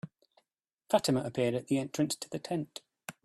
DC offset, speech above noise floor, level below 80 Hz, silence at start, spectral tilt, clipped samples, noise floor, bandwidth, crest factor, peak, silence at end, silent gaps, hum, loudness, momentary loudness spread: under 0.1%; 51 dB; -72 dBFS; 0.05 s; -5 dB/octave; under 0.1%; -82 dBFS; 14.5 kHz; 22 dB; -12 dBFS; 0.15 s; none; none; -32 LUFS; 16 LU